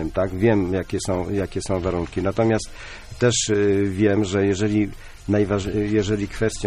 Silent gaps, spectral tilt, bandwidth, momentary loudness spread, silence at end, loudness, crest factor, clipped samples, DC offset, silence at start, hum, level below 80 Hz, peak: none; -5.5 dB/octave; 12.5 kHz; 6 LU; 0 s; -22 LUFS; 16 dB; under 0.1%; under 0.1%; 0 s; none; -40 dBFS; -6 dBFS